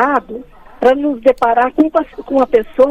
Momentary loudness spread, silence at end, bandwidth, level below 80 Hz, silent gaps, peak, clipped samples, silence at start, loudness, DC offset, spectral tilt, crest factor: 6 LU; 0 s; 8.4 kHz; -44 dBFS; none; 0 dBFS; under 0.1%; 0 s; -14 LUFS; under 0.1%; -6 dB/octave; 14 dB